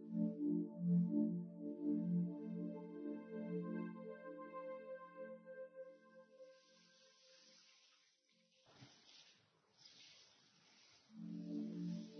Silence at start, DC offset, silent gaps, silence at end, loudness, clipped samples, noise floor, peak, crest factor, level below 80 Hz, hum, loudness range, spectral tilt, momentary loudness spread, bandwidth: 0 s; under 0.1%; none; 0 s; -45 LUFS; under 0.1%; -78 dBFS; -28 dBFS; 18 dB; under -90 dBFS; none; 24 LU; -8.5 dB/octave; 25 LU; 6.4 kHz